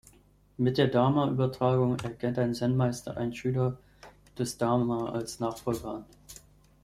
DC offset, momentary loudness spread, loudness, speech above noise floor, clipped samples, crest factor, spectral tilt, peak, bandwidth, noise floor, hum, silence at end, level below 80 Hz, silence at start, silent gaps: under 0.1%; 18 LU; -29 LUFS; 31 dB; under 0.1%; 20 dB; -7 dB/octave; -10 dBFS; 14.5 kHz; -59 dBFS; 50 Hz at -55 dBFS; 0.5 s; -58 dBFS; 0.6 s; none